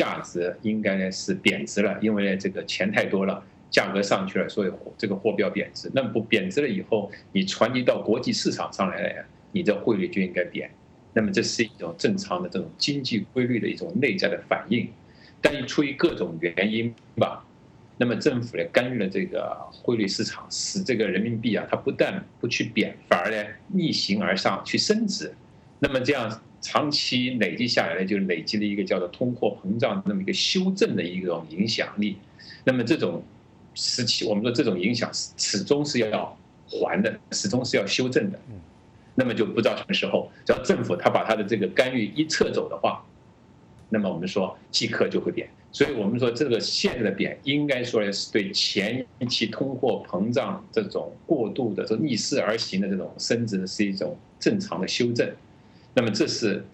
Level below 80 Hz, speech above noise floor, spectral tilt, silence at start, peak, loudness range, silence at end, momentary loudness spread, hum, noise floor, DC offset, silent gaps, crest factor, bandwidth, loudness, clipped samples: -60 dBFS; 28 dB; -4.5 dB/octave; 0 s; -6 dBFS; 2 LU; 0.05 s; 6 LU; none; -53 dBFS; under 0.1%; none; 20 dB; 10 kHz; -25 LUFS; under 0.1%